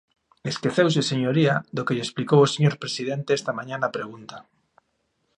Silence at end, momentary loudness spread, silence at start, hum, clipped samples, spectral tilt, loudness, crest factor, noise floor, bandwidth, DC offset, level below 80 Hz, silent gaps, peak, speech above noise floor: 1 s; 14 LU; 0.45 s; none; under 0.1%; -5.5 dB/octave; -23 LUFS; 20 dB; -73 dBFS; 10.5 kHz; under 0.1%; -66 dBFS; none; -4 dBFS; 50 dB